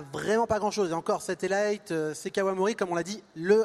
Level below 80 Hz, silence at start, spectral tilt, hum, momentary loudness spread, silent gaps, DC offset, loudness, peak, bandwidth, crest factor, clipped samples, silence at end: -62 dBFS; 0 s; -4.5 dB/octave; none; 6 LU; none; under 0.1%; -29 LUFS; -10 dBFS; 13.5 kHz; 18 dB; under 0.1%; 0 s